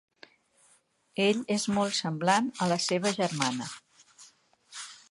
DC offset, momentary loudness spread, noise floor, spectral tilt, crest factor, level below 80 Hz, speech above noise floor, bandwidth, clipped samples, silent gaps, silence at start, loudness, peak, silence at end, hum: under 0.1%; 16 LU; -66 dBFS; -4 dB/octave; 22 dB; -74 dBFS; 38 dB; 11.5 kHz; under 0.1%; none; 1.15 s; -28 LUFS; -10 dBFS; 0.15 s; none